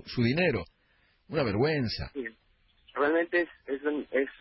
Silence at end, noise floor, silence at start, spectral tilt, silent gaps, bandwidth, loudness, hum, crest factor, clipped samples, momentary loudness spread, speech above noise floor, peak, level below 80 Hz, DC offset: 0.05 s; -68 dBFS; 0.05 s; -10 dB/octave; none; 5.8 kHz; -29 LUFS; none; 16 dB; under 0.1%; 13 LU; 39 dB; -14 dBFS; -54 dBFS; under 0.1%